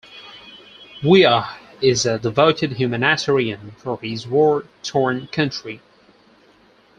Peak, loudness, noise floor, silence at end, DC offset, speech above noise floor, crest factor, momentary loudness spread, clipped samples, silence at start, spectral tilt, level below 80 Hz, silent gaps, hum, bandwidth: -2 dBFS; -18 LUFS; -53 dBFS; 1.2 s; under 0.1%; 35 dB; 18 dB; 22 LU; under 0.1%; 0.1 s; -4.5 dB/octave; -56 dBFS; none; none; 9.4 kHz